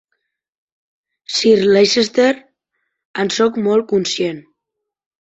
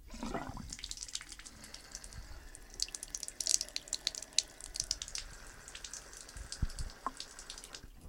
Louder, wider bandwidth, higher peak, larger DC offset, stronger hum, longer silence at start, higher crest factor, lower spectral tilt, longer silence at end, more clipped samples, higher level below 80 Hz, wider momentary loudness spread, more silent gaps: first, -15 LUFS vs -39 LUFS; second, 8.2 kHz vs 17 kHz; first, -2 dBFS vs -6 dBFS; neither; neither; first, 1.3 s vs 0 s; second, 16 dB vs 38 dB; first, -4 dB/octave vs -1 dB/octave; first, 1 s vs 0 s; neither; second, -60 dBFS vs -50 dBFS; second, 11 LU vs 17 LU; first, 3.05-3.14 s vs none